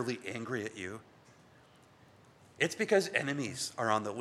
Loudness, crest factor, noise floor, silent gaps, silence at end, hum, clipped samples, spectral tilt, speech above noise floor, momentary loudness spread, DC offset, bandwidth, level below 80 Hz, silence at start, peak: -34 LUFS; 24 dB; -61 dBFS; none; 0 s; none; under 0.1%; -4 dB/octave; 27 dB; 13 LU; under 0.1%; 14.5 kHz; -78 dBFS; 0 s; -12 dBFS